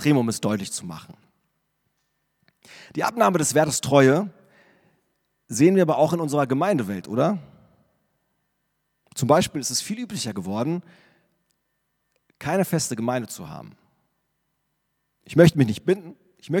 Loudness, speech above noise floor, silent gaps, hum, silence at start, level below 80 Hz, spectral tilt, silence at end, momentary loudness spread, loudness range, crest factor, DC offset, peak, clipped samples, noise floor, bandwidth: -22 LUFS; 53 dB; none; none; 0 s; -60 dBFS; -5.5 dB/octave; 0 s; 16 LU; 8 LU; 22 dB; under 0.1%; -2 dBFS; under 0.1%; -75 dBFS; 18 kHz